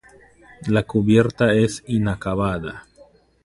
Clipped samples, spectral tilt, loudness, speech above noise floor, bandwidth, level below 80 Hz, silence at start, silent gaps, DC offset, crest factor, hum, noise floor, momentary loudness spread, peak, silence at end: under 0.1%; -7 dB/octave; -20 LUFS; 33 dB; 11.5 kHz; -44 dBFS; 0.6 s; none; under 0.1%; 20 dB; none; -52 dBFS; 15 LU; -2 dBFS; 0.65 s